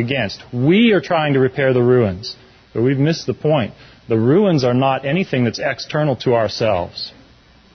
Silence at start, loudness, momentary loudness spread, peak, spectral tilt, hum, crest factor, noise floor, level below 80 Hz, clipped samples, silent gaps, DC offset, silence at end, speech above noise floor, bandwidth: 0 s; -17 LUFS; 13 LU; -4 dBFS; -7 dB/octave; none; 14 dB; -49 dBFS; -48 dBFS; under 0.1%; none; under 0.1%; 0.65 s; 32 dB; 6.6 kHz